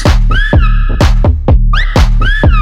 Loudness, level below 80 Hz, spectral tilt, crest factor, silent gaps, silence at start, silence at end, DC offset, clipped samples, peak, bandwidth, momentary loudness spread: -11 LUFS; -8 dBFS; -6 dB/octave; 6 dB; none; 0 s; 0 s; under 0.1%; under 0.1%; 0 dBFS; 8.6 kHz; 2 LU